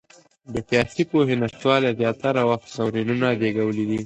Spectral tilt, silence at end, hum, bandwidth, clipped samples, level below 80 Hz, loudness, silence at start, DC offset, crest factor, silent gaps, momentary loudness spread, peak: -6.5 dB/octave; 0 s; none; 8.8 kHz; under 0.1%; -54 dBFS; -22 LUFS; 0.5 s; under 0.1%; 18 dB; none; 5 LU; -4 dBFS